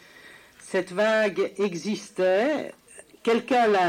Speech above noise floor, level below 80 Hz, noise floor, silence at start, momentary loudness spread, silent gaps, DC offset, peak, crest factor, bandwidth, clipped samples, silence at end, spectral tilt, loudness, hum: 26 dB; -72 dBFS; -50 dBFS; 0.25 s; 9 LU; none; under 0.1%; -10 dBFS; 14 dB; 15.5 kHz; under 0.1%; 0 s; -4.5 dB/octave; -25 LUFS; none